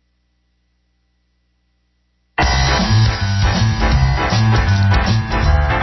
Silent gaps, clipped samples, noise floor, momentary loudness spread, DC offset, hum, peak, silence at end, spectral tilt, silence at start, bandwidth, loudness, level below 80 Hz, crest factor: none; under 0.1%; -63 dBFS; 3 LU; under 0.1%; 60 Hz at -35 dBFS; -2 dBFS; 0 s; -5.5 dB/octave; 2.35 s; 6.2 kHz; -15 LUFS; -22 dBFS; 14 dB